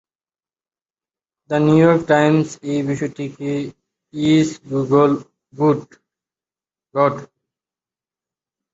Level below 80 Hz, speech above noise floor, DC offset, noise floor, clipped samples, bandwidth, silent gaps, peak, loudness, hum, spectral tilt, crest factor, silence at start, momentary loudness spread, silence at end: -58 dBFS; over 73 dB; under 0.1%; under -90 dBFS; under 0.1%; 8 kHz; none; -2 dBFS; -18 LUFS; none; -7 dB/octave; 18 dB; 1.5 s; 13 LU; 1.5 s